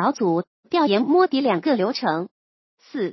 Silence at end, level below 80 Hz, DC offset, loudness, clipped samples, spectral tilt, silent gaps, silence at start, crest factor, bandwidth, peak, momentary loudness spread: 0 s; -76 dBFS; under 0.1%; -21 LUFS; under 0.1%; -6 dB/octave; 0.47-0.63 s, 2.31-2.78 s; 0 s; 16 dB; 6.2 kHz; -6 dBFS; 11 LU